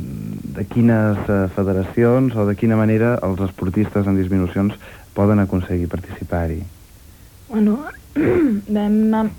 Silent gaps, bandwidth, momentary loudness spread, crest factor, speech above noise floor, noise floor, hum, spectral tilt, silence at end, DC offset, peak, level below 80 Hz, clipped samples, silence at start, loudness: none; 18.5 kHz; 11 LU; 14 dB; 26 dB; -43 dBFS; none; -9 dB/octave; 0 s; under 0.1%; -4 dBFS; -40 dBFS; under 0.1%; 0 s; -19 LUFS